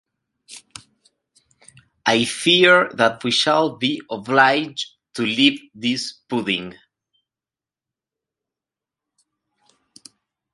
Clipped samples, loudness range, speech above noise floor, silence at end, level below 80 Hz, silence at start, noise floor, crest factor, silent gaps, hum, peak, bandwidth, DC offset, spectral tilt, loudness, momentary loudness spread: under 0.1%; 12 LU; over 71 dB; 3.8 s; -66 dBFS; 0.5 s; under -90 dBFS; 22 dB; none; none; 0 dBFS; 11.5 kHz; under 0.1%; -3.5 dB/octave; -18 LUFS; 14 LU